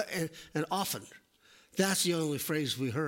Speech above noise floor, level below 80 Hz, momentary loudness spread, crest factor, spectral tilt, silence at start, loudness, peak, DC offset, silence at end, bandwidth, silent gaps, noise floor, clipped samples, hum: 30 dB; -72 dBFS; 9 LU; 18 dB; -3.5 dB/octave; 0 s; -32 LUFS; -14 dBFS; under 0.1%; 0 s; 16.5 kHz; none; -63 dBFS; under 0.1%; none